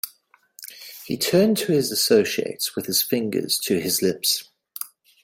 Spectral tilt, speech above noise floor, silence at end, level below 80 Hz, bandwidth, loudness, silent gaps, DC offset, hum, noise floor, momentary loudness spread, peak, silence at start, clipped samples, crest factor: -3.5 dB/octave; 36 dB; 0.35 s; -66 dBFS; 16.5 kHz; -21 LUFS; none; under 0.1%; none; -58 dBFS; 19 LU; -4 dBFS; 0.05 s; under 0.1%; 18 dB